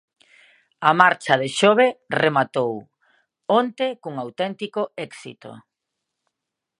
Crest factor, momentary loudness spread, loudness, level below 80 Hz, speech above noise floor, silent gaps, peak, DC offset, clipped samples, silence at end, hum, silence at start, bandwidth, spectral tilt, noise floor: 22 dB; 19 LU; -20 LUFS; -74 dBFS; 63 dB; none; 0 dBFS; under 0.1%; under 0.1%; 1.2 s; none; 0.8 s; 11 kHz; -4.5 dB/octave; -83 dBFS